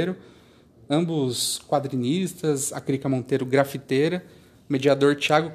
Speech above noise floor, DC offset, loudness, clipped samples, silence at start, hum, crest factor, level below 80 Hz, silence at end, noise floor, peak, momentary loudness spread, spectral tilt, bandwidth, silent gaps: 30 dB; under 0.1%; -24 LUFS; under 0.1%; 0 s; none; 20 dB; -64 dBFS; 0 s; -53 dBFS; -4 dBFS; 7 LU; -5 dB/octave; 14.5 kHz; none